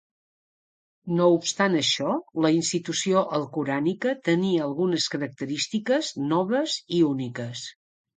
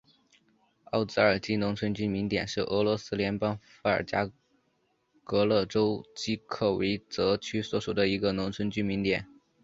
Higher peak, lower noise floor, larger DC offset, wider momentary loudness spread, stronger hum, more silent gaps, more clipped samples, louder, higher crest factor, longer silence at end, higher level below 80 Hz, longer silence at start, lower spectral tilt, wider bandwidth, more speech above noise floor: about the same, -8 dBFS vs -8 dBFS; first, under -90 dBFS vs -73 dBFS; neither; about the same, 9 LU vs 7 LU; neither; neither; neither; first, -25 LUFS vs -29 LUFS; about the same, 18 dB vs 22 dB; about the same, 0.45 s vs 0.4 s; second, -72 dBFS vs -56 dBFS; about the same, 1.05 s vs 0.95 s; second, -4.5 dB/octave vs -6 dB/octave; first, 9.6 kHz vs 7.8 kHz; first, over 66 dB vs 44 dB